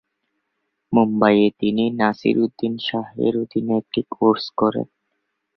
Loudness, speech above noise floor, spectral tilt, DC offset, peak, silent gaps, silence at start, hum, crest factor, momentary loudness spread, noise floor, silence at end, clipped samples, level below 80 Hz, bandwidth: -20 LUFS; 56 dB; -8 dB/octave; under 0.1%; -2 dBFS; none; 0.9 s; none; 20 dB; 9 LU; -75 dBFS; 0.7 s; under 0.1%; -60 dBFS; 6 kHz